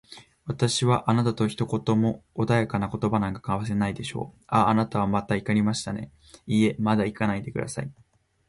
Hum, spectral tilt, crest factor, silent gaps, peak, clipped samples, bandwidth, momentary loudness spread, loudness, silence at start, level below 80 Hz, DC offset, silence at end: none; -6 dB/octave; 18 dB; none; -8 dBFS; under 0.1%; 11.5 kHz; 12 LU; -25 LUFS; 0.1 s; -52 dBFS; under 0.1%; 0.55 s